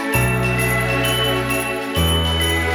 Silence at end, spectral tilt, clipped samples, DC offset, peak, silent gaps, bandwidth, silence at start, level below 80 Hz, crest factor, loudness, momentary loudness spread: 0 s; -4 dB/octave; under 0.1%; under 0.1%; -4 dBFS; none; 17.5 kHz; 0 s; -30 dBFS; 14 dB; -18 LUFS; 3 LU